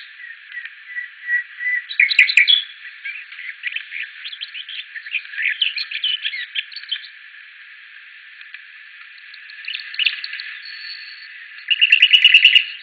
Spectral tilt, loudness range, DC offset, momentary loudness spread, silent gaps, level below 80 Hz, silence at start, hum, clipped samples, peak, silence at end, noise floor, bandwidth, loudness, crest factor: 6.5 dB/octave; 12 LU; under 0.1%; 25 LU; none; -88 dBFS; 0 s; none; under 0.1%; 0 dBFS; 0 s; -41 dBFS; 10.5 kHz; -15 LUFS; 20 dB